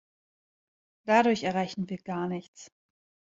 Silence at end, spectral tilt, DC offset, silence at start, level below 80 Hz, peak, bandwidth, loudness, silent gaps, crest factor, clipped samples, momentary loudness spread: 0.7 s; -5.5 dB/octave; under 0.1%; 1.05 s; -72 dBFS; -8 dBFS; 7.8 kHz; -28 LUFS; 2.48-2.53 s; 22 dB; under 0.1%; 14 LU